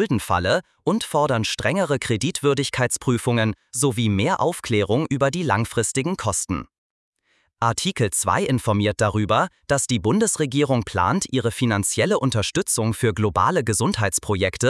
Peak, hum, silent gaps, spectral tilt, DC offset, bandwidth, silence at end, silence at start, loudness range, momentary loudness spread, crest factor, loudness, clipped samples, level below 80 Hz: -4 dBFS; none; 6.78-7.12 s; -4.5 dB/octave; under 0.1%; 12 kHz; 0 s; 0 s; 3 LU; 3 LU; 18 dB; -21 LUFS; under 0.1%; -50 dBFS